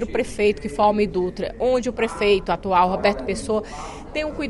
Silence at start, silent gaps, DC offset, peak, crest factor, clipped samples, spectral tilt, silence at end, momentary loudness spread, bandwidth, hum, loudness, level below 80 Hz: 0 s; none; under 0.1%; -6 dBFS; 16 dB; under 0.1%; -5 dB/octave; 0 s; 8 LU; 11.5 kHz; none; -22 LUFS; -40 dBFS